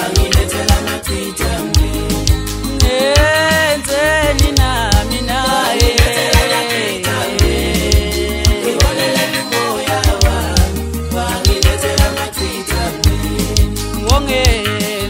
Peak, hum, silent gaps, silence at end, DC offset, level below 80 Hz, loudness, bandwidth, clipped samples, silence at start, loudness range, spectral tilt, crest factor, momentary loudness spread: 0 dBFS; none; none; 0 s; under 0.1%; -18 dBFS; -14 LUFS; 16.5 kHz; under 0.1%; 0 s; 2 LU; -4 dB/octave; 14 dB; 7 LU